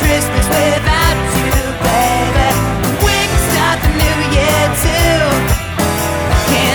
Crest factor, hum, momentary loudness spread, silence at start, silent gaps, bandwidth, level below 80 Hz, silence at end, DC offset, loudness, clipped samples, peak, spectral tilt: 12 dB; none; 3 LU; 0 s; none; over 20 kHz; -20 dBFS; 0 s; under 0.1%; -13 LUFS; under 0.1%; 0 dBFS; -4 dB/octave